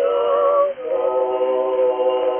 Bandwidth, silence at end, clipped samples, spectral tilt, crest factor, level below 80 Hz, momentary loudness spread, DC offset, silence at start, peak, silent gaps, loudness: 3.4 kHz; 0 s; under 0.1%; -2 dB/octave; 12 dB; -66 dBFS; 4 LU; under 0.1%; 0 s; -6 dBFS; none; -19 LUFS